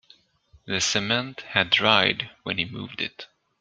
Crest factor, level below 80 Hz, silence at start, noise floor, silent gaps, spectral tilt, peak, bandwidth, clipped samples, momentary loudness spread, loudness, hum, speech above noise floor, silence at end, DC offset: 24 dB; -62 dBFS; 0.65 s; -59 dBFS; none; -2.5 dB/octave; -2 dBFS; 10 kHz; under 0.1%; 13 LU; -23 LUFS; none; 34 dB; 0.35 s; under 0.1%